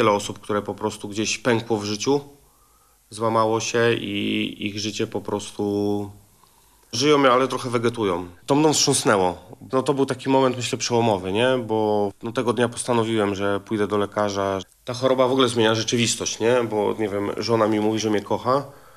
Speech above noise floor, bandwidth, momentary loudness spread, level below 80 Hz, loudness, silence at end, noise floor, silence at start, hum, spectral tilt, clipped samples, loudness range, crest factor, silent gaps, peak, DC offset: 36 dB; 14 kHz; 8 LU; -62 dBFS; -22 LUFS; 0.25 s; -58 dBFS; 0 s; none; -4 dB/octave; under 0.1%; 4 LU; 18 dB; none; -4 dBFS; under 0.1%